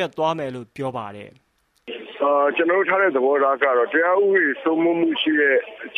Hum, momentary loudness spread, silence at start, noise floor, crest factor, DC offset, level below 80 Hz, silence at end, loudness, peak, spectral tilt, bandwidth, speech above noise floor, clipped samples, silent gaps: none; 14 LU; 0 s; -39 dBFS; 16 dB; under 0.1%; -70 dBFS; 0 s; -19 LUFS; -4 dBFS; -6 dB/octave; 9.6 kHz; 19 dB; under 0.1%; none